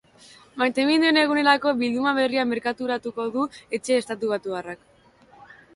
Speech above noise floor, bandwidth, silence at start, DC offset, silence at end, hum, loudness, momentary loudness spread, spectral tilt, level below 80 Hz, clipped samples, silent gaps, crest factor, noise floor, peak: 31 dB; 11.5 kHz; 0.55 s; under 0.1%; 1 s; none; -23 LUFS; 13 LU; -3.5 dB/octave; -66 dBFS; under 0.1%; none; 20 dB; -54 dBFS; -4 dBFS